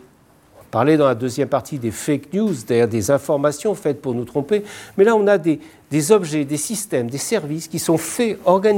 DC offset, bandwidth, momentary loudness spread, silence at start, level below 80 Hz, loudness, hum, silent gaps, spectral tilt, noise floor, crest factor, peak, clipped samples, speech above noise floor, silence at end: under 0.1%; 17 kHz; 8 LU; 0.75 s; -60 dBFS; -19 LUFS; none; none; -5.5 dB/octave; -52 dBFS; 18 dB; -2 dBFS; under 0.1%; 33 dB; 0 s